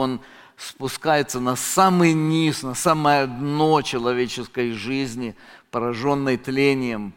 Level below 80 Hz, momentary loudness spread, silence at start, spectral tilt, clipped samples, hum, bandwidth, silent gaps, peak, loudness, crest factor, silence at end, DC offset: -54 dBFS; 12 LU; 0 s; -5 dB/octave; under 0.1%; none; 17 kHz; none; -2 dBFS; -21 LUFS; 18 dB; 0.05 s; under 0.1%